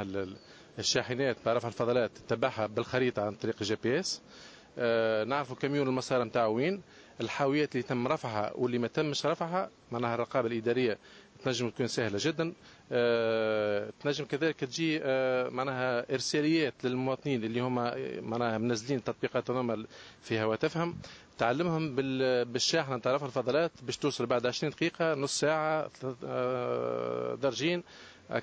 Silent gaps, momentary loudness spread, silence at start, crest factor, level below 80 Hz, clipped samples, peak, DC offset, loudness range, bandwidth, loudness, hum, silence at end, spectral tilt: none; 8 LU; 0 s; 18 dB; -68 dBFS; under 0.1%; -12 dBFS; under 0.1%; 2 LU; 8 kHz; -31 LUFS; none; 0 s; -5 dB/octave